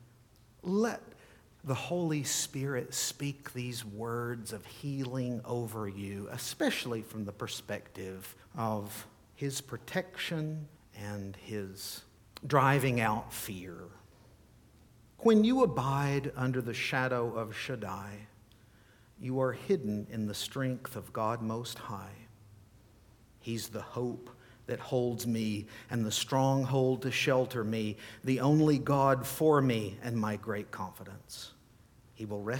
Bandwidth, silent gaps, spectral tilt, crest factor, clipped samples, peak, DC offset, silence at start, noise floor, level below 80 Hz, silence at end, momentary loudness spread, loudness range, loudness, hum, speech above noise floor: 19 kHz; none; -5 dB/octave; 22 dB; under 0.1%; -12 dBFS; under 0.1%; 0 s; -61 dBFS; -64 dBFS; 0 s; 17 LU; 9 LU; -33 LUFS; none; 29 dB